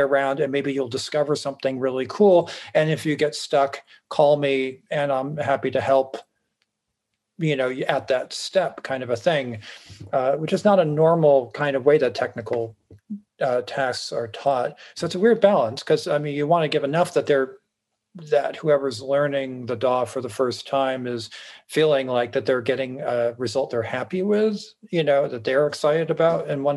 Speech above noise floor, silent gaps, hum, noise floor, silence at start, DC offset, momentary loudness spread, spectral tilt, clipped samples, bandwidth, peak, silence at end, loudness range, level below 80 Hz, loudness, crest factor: 57 dB; none; none; -79 dBFS; 0 s; under 0.1%; 10 LU; -5.5 dB/octave; under 0.1%; 12.5 kHz; -4 dBFS; 0 s; 4 LU; -72 dBFS; -22 LUFS; 18 dB